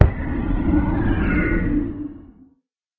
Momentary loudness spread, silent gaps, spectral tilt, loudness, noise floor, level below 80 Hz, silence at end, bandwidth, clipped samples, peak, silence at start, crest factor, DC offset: 9 LU; none; -10.5 dB/octave; -22 LUFS; -64 dBFS; -26 dBFS; 0.75 s; 4.3 kHz; under 0.1%; 0 dBFS; 0 s; 20 dB; under 0.1%